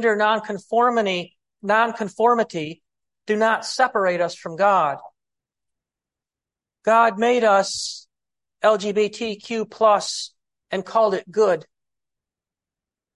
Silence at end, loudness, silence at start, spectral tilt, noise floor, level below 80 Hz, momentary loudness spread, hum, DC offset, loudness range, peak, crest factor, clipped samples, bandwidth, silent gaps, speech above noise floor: 1.55 s; -21 LUFS; 0 s; -3.5 dB/octave; under -90 dBFS; -70 dBFS; 12 LU; none; under 0.1%; 2 LU; -4 dBFS; 18 dB; under 0.1%; 11.5 kHz; none; over 70 dB